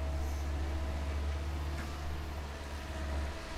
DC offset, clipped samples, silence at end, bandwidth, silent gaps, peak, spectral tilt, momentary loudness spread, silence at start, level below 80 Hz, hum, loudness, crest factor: under 0.1%; under 0.1%; 0 s; 14 kHz; none; -26 dBFS; -5.5 dB/octave; 5 LU; 0 s; -38 dBFS; none; -39 LUFS; 10 dB